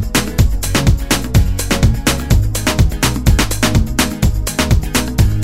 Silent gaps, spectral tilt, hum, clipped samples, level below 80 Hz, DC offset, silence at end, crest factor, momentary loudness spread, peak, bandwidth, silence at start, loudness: none; -4.5 dB/octave; none; under 0.1%; -18 dBFS; 3%; 0 s; 14 dB; 3 LU; 0 dBFS; 16.5 kHz; 0 s; -15 LUFS